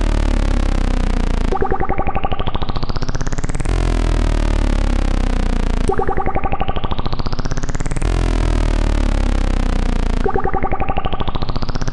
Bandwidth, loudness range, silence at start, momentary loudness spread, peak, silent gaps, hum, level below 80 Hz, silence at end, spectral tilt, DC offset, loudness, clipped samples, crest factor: 10.5 kHz; 1 LU; 0 s; 5 LU; -2 dBFS; none; none; -18 dBFS; 0 s; -6 dB/octave; under 0.1%; -21 LUFS; under 0.1%; 12 dB